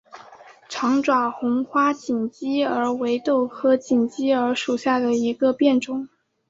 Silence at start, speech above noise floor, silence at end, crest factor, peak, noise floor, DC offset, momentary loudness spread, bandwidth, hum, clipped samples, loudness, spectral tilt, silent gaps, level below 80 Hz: 0.15 s; 26 dB; 0.45 s; 16 dB; -6 dBFS; -47 dBFS; under 0.1%; 6 LU; 7.8 kHz; none; under 0.1%; -22 LUFS; -4.5 dB/octave; none; -68 dBFS